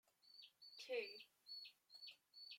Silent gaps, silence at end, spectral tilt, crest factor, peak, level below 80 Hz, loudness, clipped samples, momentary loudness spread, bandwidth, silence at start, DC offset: none; 0 s; 0 dB/octave; 22 dB; -34 dBFS; under -90 dBFS; -54 LUFS; under 0.1%; 15 LU; 16.5 kHz; 0.25 s; under 0.1%